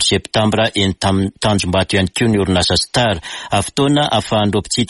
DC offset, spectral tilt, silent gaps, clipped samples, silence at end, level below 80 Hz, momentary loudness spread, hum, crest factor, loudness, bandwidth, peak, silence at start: under 0.1%; -4.5 dB/octave; none; under 0.1%; 0.05 s; -38 dBFS; 4 LU; none; 14 dB; -15 LUFS; 11.5 kHz; -2 dBFS; 0 s